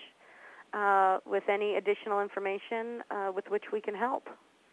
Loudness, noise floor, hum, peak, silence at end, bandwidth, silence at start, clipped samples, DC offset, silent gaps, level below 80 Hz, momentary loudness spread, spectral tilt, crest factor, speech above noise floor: -32 LUFS; -55 dBFS; none; -14 dBFS; 0.35 s; 10 kHz; 0 s; under 0.1%; under 0.1%; none; under -90 dBFS; 11 LU; -5.5 dB/octave; 18 dB; 24 dB